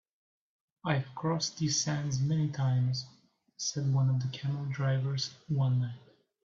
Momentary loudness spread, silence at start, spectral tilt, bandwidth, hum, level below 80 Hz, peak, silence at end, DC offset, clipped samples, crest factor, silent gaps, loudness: 7 LU; 0.85 s; -5 dB/octave; 7.6 kHz; none; -68 dBFS; -14 dBFS; 0.45 s; under 0.1%; under 0.1%; 18 dB; none; -32 LUFS